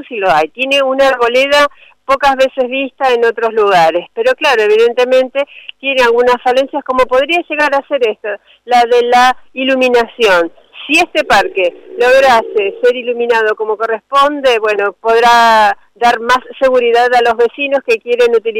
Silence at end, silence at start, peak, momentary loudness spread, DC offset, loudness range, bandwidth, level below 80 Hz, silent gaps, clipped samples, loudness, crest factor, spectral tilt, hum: 0 s; 0 s; -2 dBFS; 7 LU; under 0.1%; 2 LU; 16 kHz; -46 dBFS; none; under 0.1%; -11 LUFS; 8 dB; -2.5 dB/octave; none